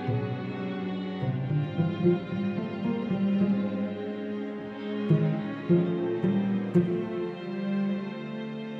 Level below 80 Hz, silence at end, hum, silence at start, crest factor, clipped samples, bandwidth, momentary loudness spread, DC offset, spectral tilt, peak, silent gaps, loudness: -64 dBFS; 0 s; none; 0 s; 16 dB; under 0.1%; 5.6 kHz; 9 LU; under 0.1%; -10 dB/octave; -12 dBFS; none; -29 LUFS